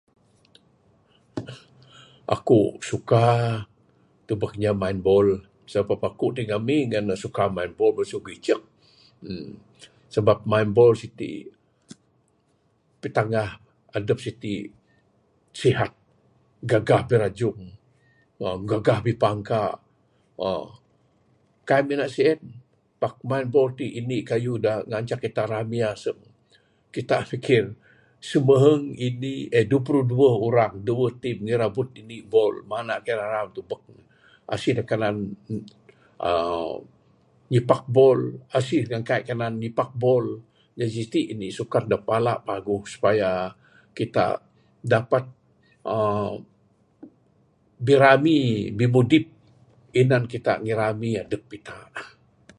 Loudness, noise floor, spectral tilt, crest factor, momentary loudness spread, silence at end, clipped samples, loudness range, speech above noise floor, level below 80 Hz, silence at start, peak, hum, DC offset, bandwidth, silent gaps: -23 LUFS; -66 dBFS; -7 dB/octave; 22 dB; 16 LU; 0.5 s; under 0.1%; 7 LU; 43 dB; -56 dBFS; 1.35 s; -2 dBFS; none; under 0.1%; 11 kHz; none